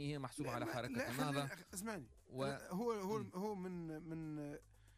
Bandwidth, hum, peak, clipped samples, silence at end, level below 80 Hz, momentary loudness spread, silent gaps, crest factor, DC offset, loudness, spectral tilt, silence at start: 15.5 kHz; none; -30 dBFS; under 0.1%; 0 s; -70 dBFS; 8 LU; none; 16 dB; under 0.1%; -45 LUFS; -5.5 dB/octave; 0 s